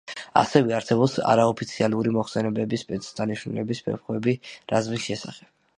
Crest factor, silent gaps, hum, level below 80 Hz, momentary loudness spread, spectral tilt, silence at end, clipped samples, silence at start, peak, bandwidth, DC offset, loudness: 22 dB; none; none; -62 dBFS; 10 LU; -6 dB/octave; 0.4 s; under 0.1%; 0.05 s; -2 dBFS; 10.5 kHz; under 0.1%; -24 LUFS